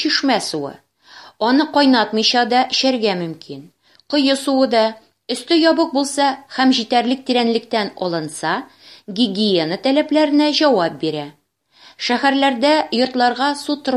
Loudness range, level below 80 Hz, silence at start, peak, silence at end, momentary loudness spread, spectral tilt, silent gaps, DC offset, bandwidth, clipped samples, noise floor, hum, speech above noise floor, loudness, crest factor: 2 LU; -68 dBFS; 0 s; -2 dBFS; 0 s; 11 LU; -4 dB/octave; none; under 0.1%; 13 kHz; under 0.1%; -50 dBFS; none; 33 dB; -17 LUFS; 16 dB